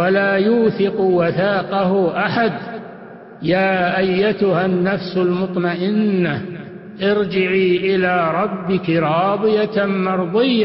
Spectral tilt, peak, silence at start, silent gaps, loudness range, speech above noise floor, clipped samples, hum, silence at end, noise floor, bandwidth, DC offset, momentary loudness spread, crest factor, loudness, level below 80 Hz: -10 dB/octave; -4 dBFS; 0 s; none; 1 LU; 20 dB; under 0.1%; none; 0 s; -37 dBFS; 5.8 kHz; under 0.1%; 6 LU; 12 dB; -17 LUFS; -54 dBFS